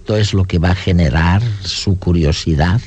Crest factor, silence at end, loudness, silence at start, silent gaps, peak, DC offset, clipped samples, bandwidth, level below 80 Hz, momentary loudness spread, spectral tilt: 10 dB; 0 s; -15 LUFS; 0 s; none; -2 dBFS; under 0.1%; under 0.1%; 8.4 kHz; -28 dBFS; 4 LU; -6 dB/octave